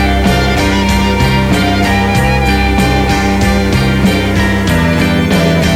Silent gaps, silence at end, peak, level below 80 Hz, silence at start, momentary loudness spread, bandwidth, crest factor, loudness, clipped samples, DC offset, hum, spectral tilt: none; 0 s; 0 dBFS; -18 dBFS; 0 s; 1 LU; 16.5 kHz; 10 dB; -11 LUFS; under 0.1%; under 0.1%; none; -5.5 dB/octave